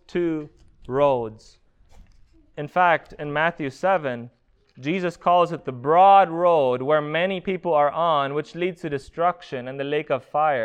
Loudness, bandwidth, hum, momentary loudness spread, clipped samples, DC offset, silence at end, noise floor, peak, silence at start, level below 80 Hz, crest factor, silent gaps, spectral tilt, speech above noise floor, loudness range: -22 LUFS; 9.2 kHz; none; 13 LU; under 0.1%; under 0.1%; 0 s; -53 dBFS; -4 dBFS; 0.15 s; -56 dBFS; 18 dB; none; -6.5 dB/octave; 32 dB; 6 LU